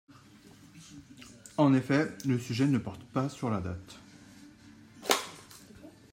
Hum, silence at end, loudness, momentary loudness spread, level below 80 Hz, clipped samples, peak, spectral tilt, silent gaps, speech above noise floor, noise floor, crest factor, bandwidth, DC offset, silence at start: none; 0.25 s; -30 LUFS; 25 LU; -66 dBFS; under 0.1%; -6 dBFS; -5.5 dB/octave; none; 26 dB; -55 dBFS; 26 dB; 16 kHz; under 0.1%; 0.75 s